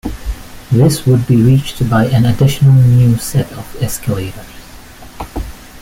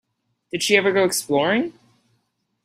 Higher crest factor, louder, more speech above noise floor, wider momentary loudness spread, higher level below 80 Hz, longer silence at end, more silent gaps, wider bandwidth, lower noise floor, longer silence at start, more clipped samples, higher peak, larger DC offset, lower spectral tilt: second, 12 dB vs 20 dB; first, -12 LUFS vs -20 LUFS; second, 23 dB vs 52 dB; first, 18 LU vs 12 LU; first, -30 dBFS vs -66 dBFS; second, 0.05 s vs 0.95 s; neither; about the same, 16.5 kHz vs 15.5 kHz; second, -34 dBFS vs -71 dBFS; second, 0.05 s vs 0.55 s; neither; about the same, -2 dBFS vs -2 dBFS; neither; first, -7 dB/octave vs -3 dB/octave